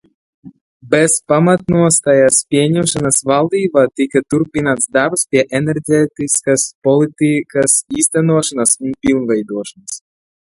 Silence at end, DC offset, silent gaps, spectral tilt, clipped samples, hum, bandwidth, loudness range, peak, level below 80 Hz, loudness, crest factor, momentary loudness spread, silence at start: 0.55 s; under 0.1%; 0.61-0.80 s, 6.75-6.82 s; -4.5 dB/octave; under 0.1%; none; 12 kHz; 2 LU; 0 dBFS; -50 dBFS; -13 LUFS; 14 dB; 6 LU; 0.45 s